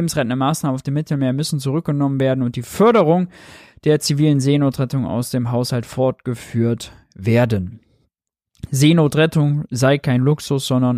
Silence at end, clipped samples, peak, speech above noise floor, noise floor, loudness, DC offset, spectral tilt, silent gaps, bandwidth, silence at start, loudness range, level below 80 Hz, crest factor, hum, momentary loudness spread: 0 s; under 0.1%; -2 dBFS; 58 dB; -75 dBFS; -18 LUFS; under 0.1%; -6.5 dB/octave; none; 15.5 kHz; 0 s; 4 LU; -50 dBFS; 16 dB; none; 9 LU